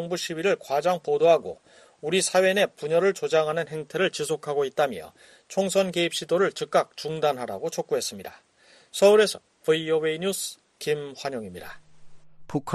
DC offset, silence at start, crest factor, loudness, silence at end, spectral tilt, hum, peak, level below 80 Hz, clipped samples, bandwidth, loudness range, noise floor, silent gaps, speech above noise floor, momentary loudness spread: under 0.1%; 0 s; 20 dB; -25 LUFS; 0 s; -3.5 dB/octave; none; -6 dBFS; -66 dBFS; under 0.1%; 13 kHz; 3 LU; -43 dBFS; none; 19 dB; 14 LU